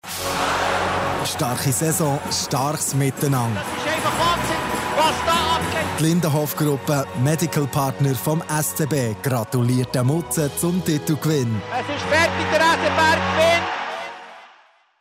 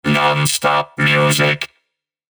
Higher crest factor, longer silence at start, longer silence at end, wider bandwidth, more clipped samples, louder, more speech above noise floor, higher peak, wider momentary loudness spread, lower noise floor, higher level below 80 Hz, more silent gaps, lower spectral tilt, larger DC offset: about the same, 14 dB vs 14 dB; about the same, 0.05 s vs 0.05 s; second, 0.55 s vs 0.7 s; second, 16 kHz vs over 20 kHz; neither; second, -20 LUFS vs -15 LUFS; second, 33 dB vs 57 dB; second, -6 dBFS vs -2 dBFS; about the same, 6 LU vs 6 LU; second, -53 dBFS vs -73 dBFS; about the same, -50 dBFS vs -52 dBFS; neither; about the same, -4.5 dB/octave vs -4 dB/octave; neither